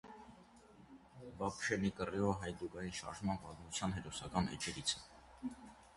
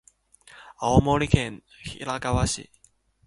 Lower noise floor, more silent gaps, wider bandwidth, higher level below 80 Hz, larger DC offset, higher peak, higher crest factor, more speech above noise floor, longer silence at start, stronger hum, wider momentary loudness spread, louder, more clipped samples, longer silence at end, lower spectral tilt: about the same, -62 dBFS vs -62 dBFS; neither; about the same, 11.5 kHz vs 11.5 kHz; second, -60 dBFS vs -38 dBFS; neither; second, -20 dBFS vs -2 dBFS; about the same, 22 dB vs 24 dB; second, 21 dB vs 38 dB; second, 0.05 s vs 0.6 s; neither; first, 21 LU vs 15 LU; second, -41 LUFS vs -24 LUFS; neither; second, 0 s vs 0.65 s; second, -4 dB/octave vs -5.5 dB/octave